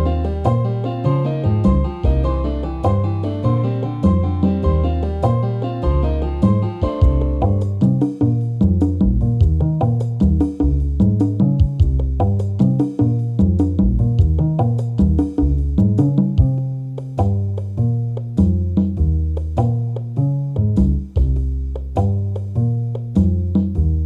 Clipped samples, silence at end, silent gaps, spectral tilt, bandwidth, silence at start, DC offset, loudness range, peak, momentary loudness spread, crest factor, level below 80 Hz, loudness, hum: under 0.1%; 0 s; none; -10.5 dB/octave; 5 kHz; 0 s; under 0.1%; 3 LU; -2 dBFS; 5 LU; 14 dB; -22 dBFS; -18 LUFS; none